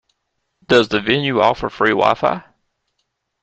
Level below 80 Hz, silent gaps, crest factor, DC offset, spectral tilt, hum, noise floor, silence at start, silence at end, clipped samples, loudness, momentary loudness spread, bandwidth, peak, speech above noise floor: -50 dBFS; none; 18 dB; under 0.1%; -5.5 dB/octave; none; -73 dBFS; 0.7 s; 1 s; under 0.1%; -16 LUFS; 5 LU; 8.4 kHz; -2 dBFS; 57 dB